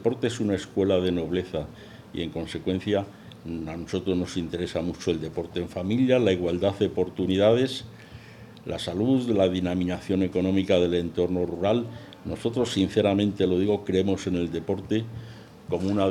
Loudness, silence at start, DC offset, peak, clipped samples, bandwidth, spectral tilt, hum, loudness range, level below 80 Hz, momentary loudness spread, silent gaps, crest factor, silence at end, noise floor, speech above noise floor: -26 LUFS; 0 s; under 0.1%; -8 dBFS; under 0.1%; 13 kHz; -6.5 dB/octave; none; 5 LU; -56 dBFS; 16 LU; none; 18 dB; 0 s; -46 dBFS; 21 dB